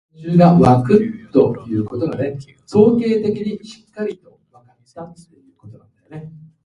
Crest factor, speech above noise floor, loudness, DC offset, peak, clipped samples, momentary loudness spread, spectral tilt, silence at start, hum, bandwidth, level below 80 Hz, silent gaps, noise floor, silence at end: 18 dB; 37 dB; -16 LUFS; under 0.1%; 0 dBFS; under 0.1%; 25 LU; -9 dB/octave; 0.2 s; none; 10 kHz; -50 dBFS; none; -53 dBFS; 0.3 s